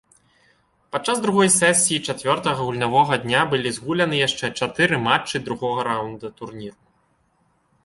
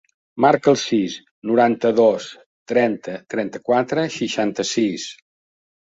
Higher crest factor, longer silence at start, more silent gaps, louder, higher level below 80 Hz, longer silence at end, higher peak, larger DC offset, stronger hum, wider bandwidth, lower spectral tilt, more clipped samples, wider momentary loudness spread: about the same, 20 dB vs 18 dB; first, 0.95 s vs 0.35 s; second, none vs 1.31-1.42 s, 2.46-2.66 s; about the same, -20 LUFS vs -19 LUFS; first, -58 dBFS vs -64 dBFS; first, 1.15 s vs 0.75 s; about the same, -2 dBFS vs -2 dBFS; neither; neither; first, 12 kHz vs 8 kHz; second, -3 dB/octave vs -4.5 dB/octave; neither; first, 16 LU vs 13 LU